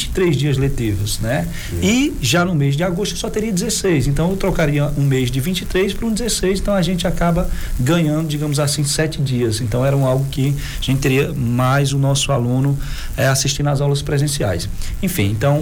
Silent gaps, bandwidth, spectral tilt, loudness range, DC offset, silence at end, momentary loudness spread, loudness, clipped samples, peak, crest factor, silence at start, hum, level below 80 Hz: none; 18 kHz; -5 dB/octave; 1 LU; under 0.1%; 0 s; 5 LU; -18 LUFS; under 0.1%; -4 dBFS; 14 dB; 0 s; none; -28 dBFS